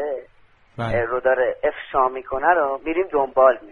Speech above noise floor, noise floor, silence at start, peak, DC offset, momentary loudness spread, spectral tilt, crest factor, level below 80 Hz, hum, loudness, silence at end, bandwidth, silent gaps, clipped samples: 34 dB; -54 dBFS; 0 s; -2 dBFS; under 0.1%; 8 LU; -8 dB/octave; 18 dB; -48 dBFS; none; -21 LUFS; 0 s; 4.3 kHz; none; under 0.1%